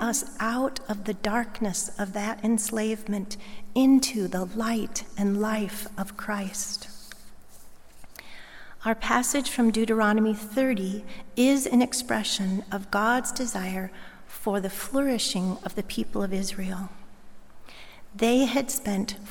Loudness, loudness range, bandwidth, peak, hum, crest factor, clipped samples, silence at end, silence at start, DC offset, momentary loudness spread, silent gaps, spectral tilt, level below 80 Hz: -27 LUFS; 7 LU; 17.5 kHz; -6 dBFS; none; 20 dB; under 0.1%; 0 s; 0 s; under 0.1%; 16 LU; none; -4 dB/octave; -50 dBFS